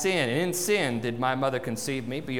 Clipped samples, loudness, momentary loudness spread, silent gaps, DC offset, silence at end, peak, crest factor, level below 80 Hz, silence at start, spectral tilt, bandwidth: under 0.1%; -27 LUFS; 6 LU; none; 0.4%; 0 s; -12 dBFS; 16 dB; -60 dBFS; 0 s; -4 dB/octave; 19.5 kHz